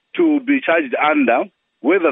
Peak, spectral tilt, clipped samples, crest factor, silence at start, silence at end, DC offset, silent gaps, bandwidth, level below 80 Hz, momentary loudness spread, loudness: -2 dBFS; -9.5 dB/octave; under 0.1%; 14 dB; 0.15 s; 0 s; under 0.1%; none; 3.8 kHz; -80 dBFS; 6 LU; -17 LUFS